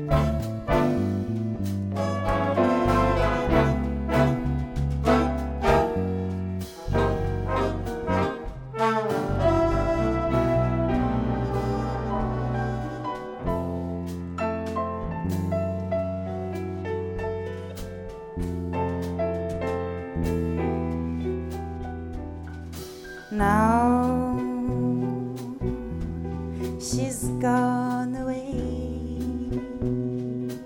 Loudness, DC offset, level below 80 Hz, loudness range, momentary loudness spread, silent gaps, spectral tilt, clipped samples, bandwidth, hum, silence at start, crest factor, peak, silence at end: -26 LUFS; under 0.1%; -36 dBFS; 6 LU; 11 LU; none; -7 dB/octave; under 0.1%; 17.5 kHz; none; 0 s; 18 dB; -8 dBFS; 0 s